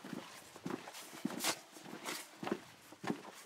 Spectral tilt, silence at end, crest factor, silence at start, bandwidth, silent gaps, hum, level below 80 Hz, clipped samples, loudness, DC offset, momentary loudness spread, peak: -3 dB/octave; 0 s; 22 dB; 0 s; 16 kHz; none; none; -88 dBFS; under 0.1%; -43 LUFS; under 0.1%; 11 LU; -22 dBFS